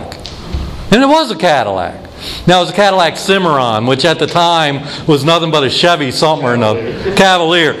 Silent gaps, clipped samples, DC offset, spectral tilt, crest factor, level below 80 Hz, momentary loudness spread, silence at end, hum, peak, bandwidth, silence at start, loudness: none; under 0.1%; under 0.1%; -4.5 dB/octave; 12 dB; -32 dBFS; 14 LU; 0 s; none; 0 dBFS; 15.5 kHz; 0 s; -11 LUFS